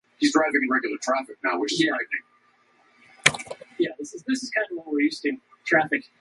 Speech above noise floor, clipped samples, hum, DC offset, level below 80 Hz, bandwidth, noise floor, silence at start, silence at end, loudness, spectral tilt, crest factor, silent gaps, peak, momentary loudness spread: 37 dB; under 0.1%; none; under 0.1%; -68 dBFS; 11.5 kHz; -62 dBFS; 0.2 s; 0.2 s; -24 LUFS; -3 dB/octave; 26 dB; none; 0 dBFS; 9 LU